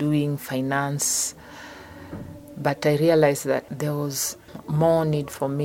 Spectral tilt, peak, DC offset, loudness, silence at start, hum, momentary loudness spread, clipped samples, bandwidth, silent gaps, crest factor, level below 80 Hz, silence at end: -5 dB/octave; -4 dBFS; under 0.1%; -23 LUFS; 0 s; none; 20 LU; under 0.1%; 17 kHz; none; 20 dB; -56 dBFS; 0 s